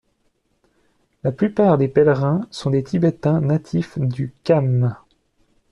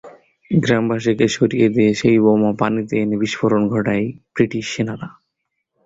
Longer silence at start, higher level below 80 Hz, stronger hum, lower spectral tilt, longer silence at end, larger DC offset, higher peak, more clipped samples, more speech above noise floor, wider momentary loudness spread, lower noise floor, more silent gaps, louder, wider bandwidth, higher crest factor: first, 1.25 s vs 0.05 s; about the same, -54 dBFS vs -52 dBFS; neither; first, -9 dB/octave vs -6.5 dB/octave; about the same, 0.75 s vs 0.75 s; neither; about the same, -4 dBFS vs -2 dBFS; neither; second, 48 dB vs 59 dB; about the same, 9 LU vs 9 LU; second, -66 dBFS vs -75 dBFS; neither; about the same, -19 LUFS vs -18 LUFS; first, 10 kHz vs 7.8 kHz; about the same, 16 dB vs 16 dB